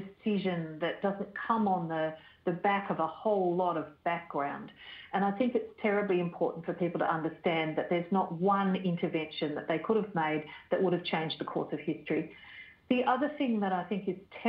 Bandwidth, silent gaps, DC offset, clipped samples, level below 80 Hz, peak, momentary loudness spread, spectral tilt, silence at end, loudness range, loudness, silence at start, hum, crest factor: 5.2 kHz; none; under 0.1%; under 0.1%; -72 dBFS; -14 dBFS; 7 LU; -9.5 dB/octave; 0 s; 2 LU; -32 LUFS; 0 s; none; 18 dB